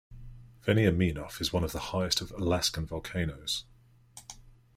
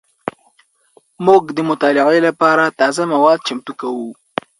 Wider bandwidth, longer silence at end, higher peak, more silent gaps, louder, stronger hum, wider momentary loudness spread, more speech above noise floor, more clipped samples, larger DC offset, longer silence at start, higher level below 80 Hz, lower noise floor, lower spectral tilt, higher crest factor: first, 16 kHz vs 11.5 kHz; second, 0.25 s vs 0.45 s; second, -12 dBFS vs 0 dBFS; neither; second, -30 LUFS vs -15 LUFS; neither; first, 21 LU vs 14 LU; second, 25 dB vs 42 dB; neither; neither; second, 0.1 s vs 0.25 s; first, -48 dBFS vs -66 dBFS; about the same, -55 dBFS vs -57 dBFS; about the same, -4.5 dB/octave vs -5 dB/octave; about the same, 20 dB vs 16 dB